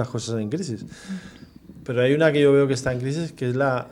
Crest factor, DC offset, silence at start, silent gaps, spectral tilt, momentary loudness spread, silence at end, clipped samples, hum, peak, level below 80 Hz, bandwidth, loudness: 18 dB; under 0.1%; 0 s; none; -6 dB/octave; 18 LU; 0 s; under 0.1%; none; -4 dBFS; -54 dBFS; 11.5 kHz; -22 LUFS